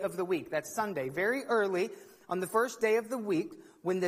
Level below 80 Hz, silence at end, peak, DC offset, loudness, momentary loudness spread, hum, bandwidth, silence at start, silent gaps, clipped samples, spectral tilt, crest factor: -76 dBFS; 0 s; -14 dBFS; under 0.1%; -32 LUFS; 9 LU; none; 15.5 kHz; 0 s; none; under 0.1%; -5 dB/octave; 18 dB